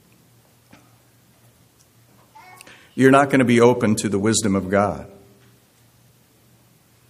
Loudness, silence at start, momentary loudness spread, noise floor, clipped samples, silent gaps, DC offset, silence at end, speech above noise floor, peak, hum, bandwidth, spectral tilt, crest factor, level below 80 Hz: -17 LUFS; 2.95 s; 9 LU; -56 dBFS; under 0.1%; none; under 0.1%; 2.05 s; 39 dB; 0 dBFS; none; 15 kHz; -5 dB/octave; 22 dB; -58 dBFS